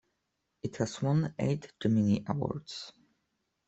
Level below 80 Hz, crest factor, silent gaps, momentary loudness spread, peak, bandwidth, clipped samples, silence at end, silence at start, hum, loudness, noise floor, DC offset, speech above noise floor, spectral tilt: -64 dBFS; 18 dB; none; 14 LU; -14 dBFS; 8.2 kHz; under 0.1%; 0.8 s; 0.65 s; none; -32 LUFS; -82 dBFS; under 0.1%; 51 dB; -7 dB/octave